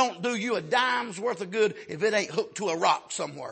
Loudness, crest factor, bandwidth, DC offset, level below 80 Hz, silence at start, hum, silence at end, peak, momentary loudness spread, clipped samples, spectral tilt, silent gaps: -27 LUFS; 18 dB; 8.8 kHz; under 0.1%; -78 dBFS; 0 s; none; 0 s; -8 dBFS; 7 LU; under 0.1%; -3 dB/octave; none